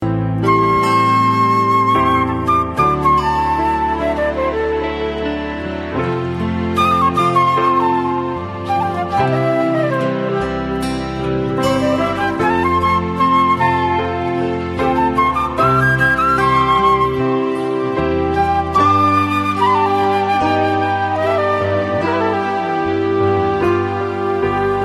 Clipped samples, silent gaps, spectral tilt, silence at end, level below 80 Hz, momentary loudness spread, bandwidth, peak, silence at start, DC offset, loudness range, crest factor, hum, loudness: under 0.1%; none; -6.5 dB/octave; 0 s; -36 dBFS; 7 LU; 13.5 kHz; -2 dBFS; 0 s; under 0.1%; 3 LU; 14 dB; none; -16 LUFS